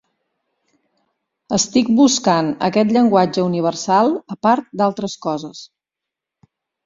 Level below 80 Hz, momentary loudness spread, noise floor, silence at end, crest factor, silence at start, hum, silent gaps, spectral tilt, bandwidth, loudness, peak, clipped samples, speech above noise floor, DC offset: -58 dBFS; 11 LU; -85 dBFS; 1.2 s; 16 dB; 1.5 s; none; none; -4.5 dB/octave; 7.8 kHz; -17 LUFS; -2 dBFS; under 0.1%; 68 dB; under 0.1%